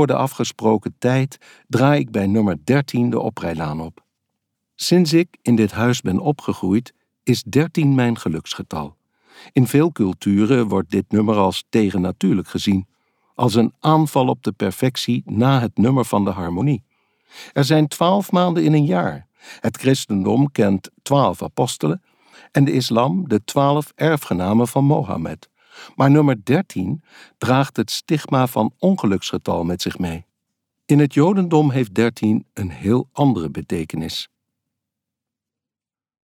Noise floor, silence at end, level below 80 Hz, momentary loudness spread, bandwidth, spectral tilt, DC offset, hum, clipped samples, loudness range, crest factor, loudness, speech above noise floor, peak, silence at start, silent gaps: under -90 dBFS; 2.1 s; -54 dBFS; 10 LU; 17 kHz; -6.5 dB/octave; under 0.1%; none; under 0.1%; 2 LU; 16 dB; -19 LUFS; over 72 dB; -2 dBFS; 0 s; none